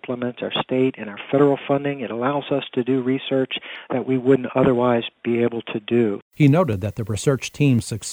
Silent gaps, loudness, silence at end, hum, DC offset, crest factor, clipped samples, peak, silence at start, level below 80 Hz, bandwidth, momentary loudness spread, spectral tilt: 6.22-6.31 s; -21 LUFS; 0 s; none; under 0.1%; 18 dB; under 0.1%; -4 dBFS; 0.05 s; -54 dBFS; 16 kHz; 9 LU; -6.5 dB/octave